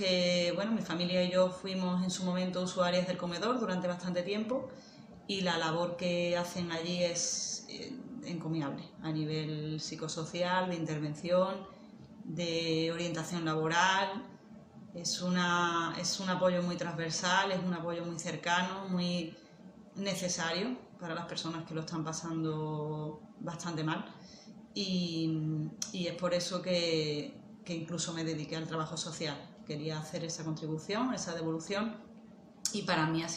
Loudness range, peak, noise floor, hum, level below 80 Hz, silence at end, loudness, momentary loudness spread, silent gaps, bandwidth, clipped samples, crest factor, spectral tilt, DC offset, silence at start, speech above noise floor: 5 LU; -10 dBFS; -55 dBFS; none; -72 dBFS; 0 s; -34 LUFS; 13 LU; none; 12 kHz; under 0.1%; 24 dB; -4 dB/octave; under 0.1%; 0 s; 21 dB